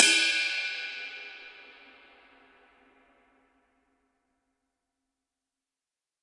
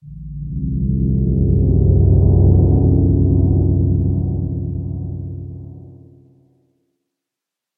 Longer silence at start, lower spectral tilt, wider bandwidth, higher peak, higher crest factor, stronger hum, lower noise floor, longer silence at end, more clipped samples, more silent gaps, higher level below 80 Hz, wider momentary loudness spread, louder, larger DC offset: about the same, 0 s vs 0.05 s; second, 2.5 dB/octave vs -17 dB/octave; first, 11.5 kHz vs 1.1 kHz; about the same, -2 dBFS vs -2 dBFS; first, 32 dB vs 14 dB; neither; first, under -90 dBFS vs -84 dBFS; first, 4.5 s vs 1.85 s; neither; neither; second, -84 dBFS vs -24 dBFS; first, 26 LU vs 17 LU; second, -26 LUFS vs -16 LUFS; neither